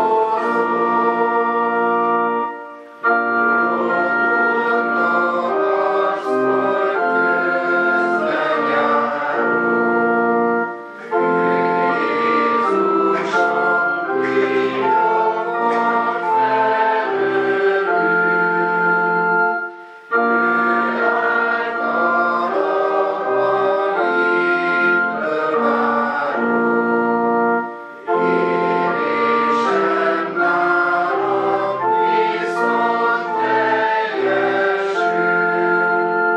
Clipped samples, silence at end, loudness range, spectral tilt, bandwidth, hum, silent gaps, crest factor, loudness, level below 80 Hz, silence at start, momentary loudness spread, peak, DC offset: under 0.1%; 0 s; 1 LU; -6.5 dB/octave; 9 kHz; none; none; 12 dB; -17 LUFS; -80 dBFS; 0 s; 3 LU; -4 dBFS; under 0.1%